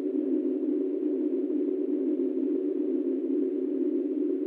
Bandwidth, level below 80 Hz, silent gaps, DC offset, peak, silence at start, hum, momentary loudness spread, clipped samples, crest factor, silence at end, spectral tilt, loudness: 3.3 kHz; -88 dBFS; none; under 0.1%; -18 dBFS; 0 s; none; 1 LU; under 0.1%; 10 dB; 0 s; -9.5 dB/octave; -29 LUFS